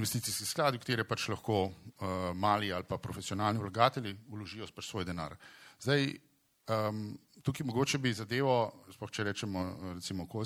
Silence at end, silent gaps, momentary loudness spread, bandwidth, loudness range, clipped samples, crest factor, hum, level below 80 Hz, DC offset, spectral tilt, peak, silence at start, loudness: 0 s; none; 13 LU; 16.5 kHz; 3 LU; under 0.1%; 26 dB; none; -64 dBFS; under 0.1%; -4.5 dB/octave; -10 dBFS; 0 s; -34 LUFS